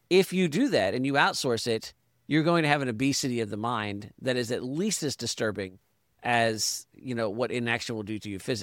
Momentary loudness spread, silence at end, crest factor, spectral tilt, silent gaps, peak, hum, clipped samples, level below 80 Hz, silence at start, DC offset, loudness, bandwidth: 11 LU; 0 s; 20 dB; -4 dB/octave; none; -8 dBFS; none; under 0.1%; -66 dBFS; 0.1 s; under 0.1%; -28 LUFS; 17 kHz